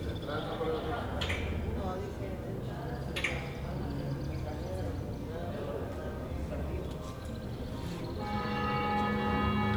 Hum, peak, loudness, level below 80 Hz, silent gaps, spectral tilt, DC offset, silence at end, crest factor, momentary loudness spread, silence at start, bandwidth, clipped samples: none; -18 dBFS; -36 LUFS; -44 dBFS; none; -6.5 dB/octave; under 0.1%; 0 s; 16 dB; 8 LU; 0 s; over 20 kHz; under 0.1%